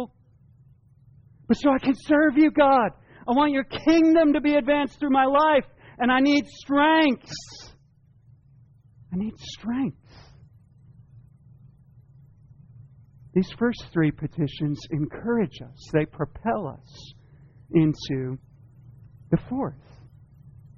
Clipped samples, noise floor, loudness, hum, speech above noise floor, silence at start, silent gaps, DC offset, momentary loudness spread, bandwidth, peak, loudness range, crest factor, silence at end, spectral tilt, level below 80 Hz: under 0.1%; -58 dBFS; -23 LUFS; none; 35 dB; 0 s; none; under 0.1%; 15 LU; 7.2 kHz; -8 dBFS; 15 LU; 18 dB; 1.05 s; -5 dB/octave; -52 dBFS